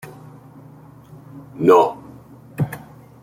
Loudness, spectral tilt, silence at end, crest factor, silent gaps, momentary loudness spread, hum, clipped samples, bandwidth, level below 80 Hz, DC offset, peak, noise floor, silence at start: -18 LUFS; -7.5 dB/octave; 0.45 s; 20 dB; none; 26 LU; none; under 0.1%; 16.5 kHz; -58 dBFS; under 0.1%; -2 dBFS; -43 dBFS; 0.05 s